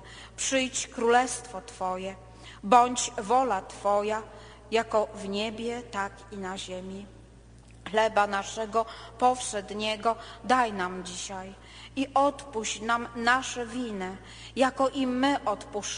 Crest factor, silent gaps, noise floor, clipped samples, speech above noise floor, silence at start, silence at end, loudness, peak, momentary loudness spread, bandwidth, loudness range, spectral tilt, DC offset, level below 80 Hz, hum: 24 dB; none; -51 dBFS; under 0.1%; 23 dB; 0 s; 0 s; -28 LUFS; -6 dBFS; 14 LU; 10 kHz; 5 LU; -3 dB/octave; under 0.1%; -54 dBFS; none